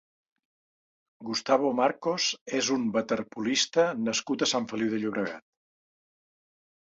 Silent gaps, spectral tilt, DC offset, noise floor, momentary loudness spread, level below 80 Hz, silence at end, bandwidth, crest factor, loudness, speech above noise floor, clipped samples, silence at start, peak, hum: 2.41-2.46 s; -3 dB/octave; under 0.1%; under -90 dBFS; 8 LU; -72 dBFS; 1.55 s; 8 kHz; 22 dB; -28 LUFS; over 62 dB; under 0.1%; 1.2 s; -8 dBFS; none